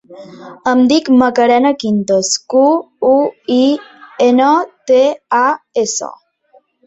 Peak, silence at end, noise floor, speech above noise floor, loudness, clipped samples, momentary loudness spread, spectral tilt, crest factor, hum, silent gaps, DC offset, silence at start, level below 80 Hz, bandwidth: 0 dBFS; 0.75 s; -51 dBFS; 39 dB; -13 LUFS; under 0.1%; 7 LU; -4 dB/octave; 12 dB; none; none; under 0.1%; 0.1 s; -58 dBFS; 8.2 kHz